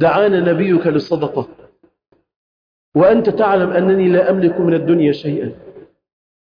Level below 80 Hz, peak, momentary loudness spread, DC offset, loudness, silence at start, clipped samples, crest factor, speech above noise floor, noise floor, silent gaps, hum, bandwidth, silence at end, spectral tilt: -54 dBFS; -2 dBFS; 10 LU; under 0.1%; -15 LUFS; 0 s; under 0.1%; 12 dB; over 76 dB; under -90 dBFS; 2.36-2.92 s; none; 5.2 kHz; 0.75 s; -9.5 dB/octave